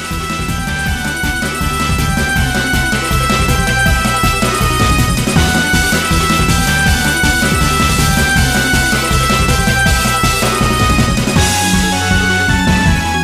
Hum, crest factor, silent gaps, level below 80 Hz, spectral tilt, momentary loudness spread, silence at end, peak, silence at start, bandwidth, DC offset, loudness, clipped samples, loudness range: none; 12 dB; none; -20 dBFS; -3.5 dB/octave; 5 LU; 0 s; 0 dBFS; 0 s; 15.5 kHz; under 0.1%; -12 LUFS; under 0.1%; 2 LU